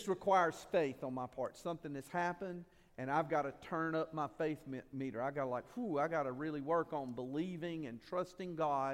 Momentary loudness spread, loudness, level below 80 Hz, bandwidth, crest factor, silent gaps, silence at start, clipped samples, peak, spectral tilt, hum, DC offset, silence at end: 9 LU; -39 LUFS; -72 dBFS; 16 kHz; 20 dB; none; 0 s; under 0.1%; -20 dBFS; -6.5 dB/octave; none; under 0.1%; 0 s